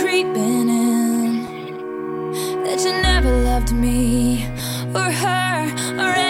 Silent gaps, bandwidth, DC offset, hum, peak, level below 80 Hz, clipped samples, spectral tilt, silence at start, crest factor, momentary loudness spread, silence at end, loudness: none; 16.5 kHz; under 0.1%; none; -4 dBFS; -26 dBFS; under 0.1%; -4.5 dB/octave; 0 s; 14 dB; 9 LU; 0 s; -19 LUFS